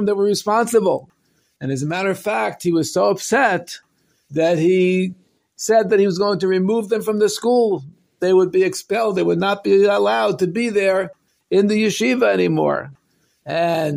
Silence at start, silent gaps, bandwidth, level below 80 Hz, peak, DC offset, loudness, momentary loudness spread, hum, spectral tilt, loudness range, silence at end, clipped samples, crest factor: 0 s; none; 16 kHz; -64 dBFS; -4 dBFS; under 0.1%; -18 LUFS; 10 LU; none; -5 dB/octave; 2 LU; 0 s; under 0.1%; 14 dB